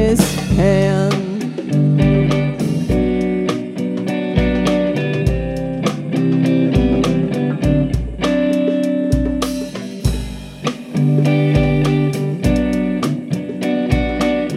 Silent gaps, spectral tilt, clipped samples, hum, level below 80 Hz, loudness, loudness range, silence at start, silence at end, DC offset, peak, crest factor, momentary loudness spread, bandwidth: none; -7 dB/octave; under 0.1%; none; -28 dBFS; -17 LUFS; 2 LU; 0 s; 0 s; under 0.1%; 0 dBFS; 16 dB; 8 LU; 15 kHz